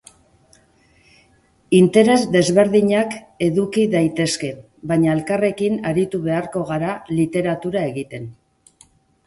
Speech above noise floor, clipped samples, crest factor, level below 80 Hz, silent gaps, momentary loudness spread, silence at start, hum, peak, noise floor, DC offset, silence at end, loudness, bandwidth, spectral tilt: 39 dB; under 0.1%; 18 dB; -56 dBFS; none; 11 LU; 1.7 s; none; 0 dBFS; -57 dBFS; under 0.1%; 0.95 s; -18 LUFS; 11.5 kHz; -6 dB/octave